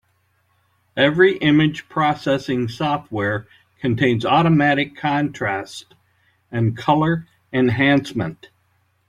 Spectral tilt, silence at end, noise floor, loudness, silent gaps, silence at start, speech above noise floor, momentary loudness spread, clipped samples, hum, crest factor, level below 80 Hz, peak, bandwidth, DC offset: -7 dB/octave; 0.75 s; -64 dBFS; -19 LUFS; none; 0.95 s; 46 dB; 12 LU; under 0.1%; none; 18 dB; -54 dBFS; -2 dBFS; 11 kHz; under 0.1%